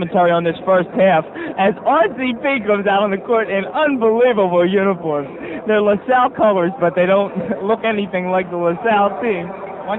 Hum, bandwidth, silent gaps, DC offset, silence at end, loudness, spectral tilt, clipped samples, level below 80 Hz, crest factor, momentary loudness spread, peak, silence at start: none; 4.1 kHz; none; under 0.1%; 0 s; -16 LUFS; -8.5 dB/octave; under 0.1%; -56 dBFS; 14 dB; 7 LU; -2 dBFS; 0 s